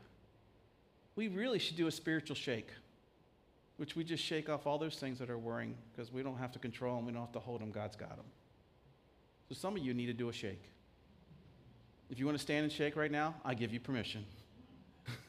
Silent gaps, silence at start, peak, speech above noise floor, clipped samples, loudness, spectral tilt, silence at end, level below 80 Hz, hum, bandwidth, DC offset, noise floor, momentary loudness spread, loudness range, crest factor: none; 0 s; -22 dBFS; 29 dB; under 0.1%; -41 LUFS; -5.5 dB/octave; 0 s; -72 dBFS; none; 15.5 kHz; under 0.1%; -69 dBFS; 17 LU; 6 LU; 22 dB